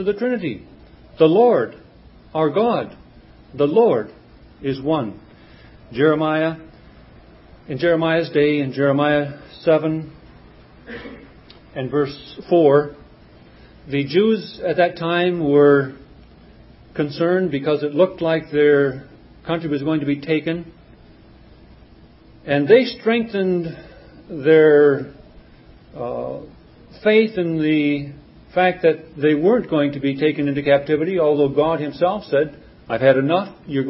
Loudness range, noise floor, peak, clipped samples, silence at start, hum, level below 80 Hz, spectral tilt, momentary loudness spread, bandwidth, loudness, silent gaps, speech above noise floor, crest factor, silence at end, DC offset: 5 LU; -47 dBFS; 0 dBFS; under 0.1%; 0 s; none; -52 dBFS; -11 dB/octave; 17 LU; 5.8 kHz; -18 LUFS; none; 29 dB; 20 dB; 0 s; under 0.1%